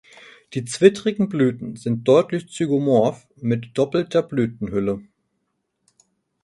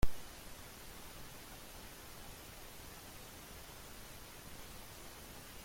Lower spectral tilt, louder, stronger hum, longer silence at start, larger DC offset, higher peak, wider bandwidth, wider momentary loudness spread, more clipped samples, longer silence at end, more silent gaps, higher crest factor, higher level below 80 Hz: first, -6.5 dB/octave vs -3.5 dB/octave; first, -21 LUFS vs -51 LUFS; neither; first, 0.5 s vs 0 s; neither; first, 0 dBFS vs -18 dBFS; second, 11.5 kHz vs 16.5 kHz; first, 12 LU vs 0 LU; neither; first, 1.4 s vs 0 s; neither; about the same, 22 dB vs 24 dB; second, -58 dBFS vs -52 dBFS